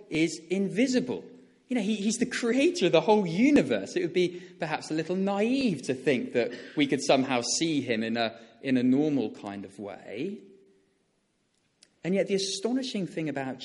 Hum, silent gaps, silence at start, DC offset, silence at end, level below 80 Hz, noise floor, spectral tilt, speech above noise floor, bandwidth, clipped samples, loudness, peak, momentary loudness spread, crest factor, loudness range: none; none; 0.1 s; under 0.1%; 0 s; -70 dBFS; -73 dBFS; -4.5 dB/octave; 46 dB; 11.5 kHz; under 0.1%; -27 LUFS; -8 dBFS; 13 LU; 20 dB; 7 LU